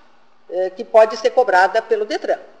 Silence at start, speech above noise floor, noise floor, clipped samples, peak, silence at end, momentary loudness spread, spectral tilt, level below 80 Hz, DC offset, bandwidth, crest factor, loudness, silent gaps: 0.5 s; 36 dB; -52 dBFS; under 0.1%; -2 dBFS; 0.15 s; 10 LU; -2.5 dB/octave; -72 dBFS; 0.4%; 10 kHz; 16 dB; -17 LUFS; none